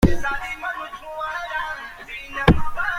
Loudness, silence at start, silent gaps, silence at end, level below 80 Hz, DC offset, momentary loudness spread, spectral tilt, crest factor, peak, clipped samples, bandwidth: -25 LUFS; 0 s; none; 0 s; -30 dBFS; under 0.1%; 14 LU; -6.5 dB/octave; 20 dB; -2 dBFS; under 0.1%; 15.5 kHz